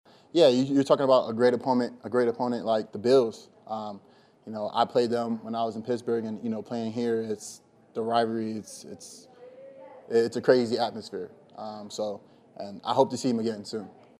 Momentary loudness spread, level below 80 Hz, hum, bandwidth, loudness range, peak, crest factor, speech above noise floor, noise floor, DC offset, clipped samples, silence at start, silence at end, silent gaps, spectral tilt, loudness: 20 LU; -76 dBFS; none; 12.5 kHz; 7 LU; -6 dBFS; 22 dB; 22 dB; -48 dBFS; under 0.1%; under 0.1%; 0.35 s; 0.3 s; none; -5.5 dB/octave; -27 LUFS